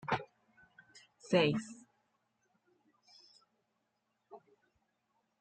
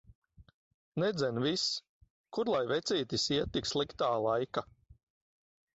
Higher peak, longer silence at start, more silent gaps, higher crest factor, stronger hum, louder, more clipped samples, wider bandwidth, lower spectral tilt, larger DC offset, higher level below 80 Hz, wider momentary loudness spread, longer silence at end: about the same, -18 dBFS vs -18 dBFS; second, 0.05 s vs 0.4 s; second, none vs 0.54-0.92 s, 1.89-2.01 s, 2.10-2.24 s; first, 24 dB vs 18 dB; neither; about the same, -33 LUFS vs -33 LUFS; neither; first, 9 kHz vs 8 kHz; first, -5.5 dB/octave vs -4 dB/octave; neither; second, -76 dBFS vs -60 dBFS; first, 27 LU vs 7 LU; first, 1.05 s vs 0.8 s